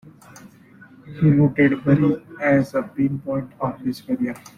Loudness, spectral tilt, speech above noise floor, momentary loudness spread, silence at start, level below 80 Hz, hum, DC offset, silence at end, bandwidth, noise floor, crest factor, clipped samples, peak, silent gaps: -20 LUFS; -9 dB/octave; 28 dB; 11 LU; 0.45 s; -52 dBFS; none; under 0.1%; 0.2 s; 12.5 kHz; -48 dBFS; 16 dB; under 0.1%; -4 dBFS; none